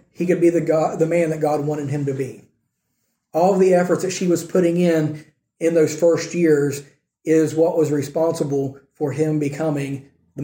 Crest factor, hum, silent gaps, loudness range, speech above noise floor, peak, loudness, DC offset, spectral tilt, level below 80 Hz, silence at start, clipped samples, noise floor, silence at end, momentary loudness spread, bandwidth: 14 dB; none; none; 3 LU; 54 dB; -4 dBFS; -19 LUFS; under 0.1%; -6.5 dB/octave; -64 dBFS; 0.2 s; under 0.1%; -72 dBFS; 0 s; 11 LU; 16.5 kHz